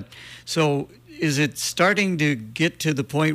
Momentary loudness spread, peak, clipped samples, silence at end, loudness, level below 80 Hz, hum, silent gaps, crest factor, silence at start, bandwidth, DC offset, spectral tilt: 10 LU; -6 dBFS; under 0.1%; 0 s; -22 LUFS; -60 dBFS; none; none; 16 dB; 0 s; 15.5 kHz; under 0.1%; -4.5 dB/octave